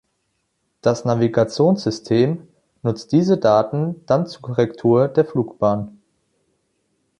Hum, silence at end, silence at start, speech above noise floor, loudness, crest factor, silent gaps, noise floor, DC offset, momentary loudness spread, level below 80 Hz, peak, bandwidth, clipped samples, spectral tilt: none; 1.3 s; 0.85 s; 53 dB; -19 LUFS; 18 dB; none; -71 dBFS; under 0.1%; 9 LU; -56 dBFS; -2 dBFS; 10.5 kHz; under 0.1%; -7.5 dB/octave